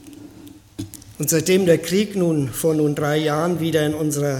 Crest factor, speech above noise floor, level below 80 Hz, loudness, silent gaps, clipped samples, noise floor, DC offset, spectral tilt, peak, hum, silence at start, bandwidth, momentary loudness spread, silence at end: 16 dB; 24 dB; -52 dBFS; -19 LUFS; none; under 0.1%; -43 dBFS; under 0.1%; -5 dB/octave; -4 dBFS; none; 0.05 s; 17.5 kHz; 18 LU; 0 s